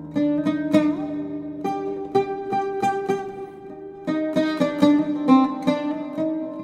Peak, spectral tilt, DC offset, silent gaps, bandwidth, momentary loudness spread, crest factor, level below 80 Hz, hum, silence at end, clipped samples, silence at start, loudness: -4 dBFS; -7 dB/octave; under 0.1%; none; 10.5 kHz; 13 LU; 20 dB; -62 dBFS; none; 0 s; under 0.1%; 0 s; -23 LUFS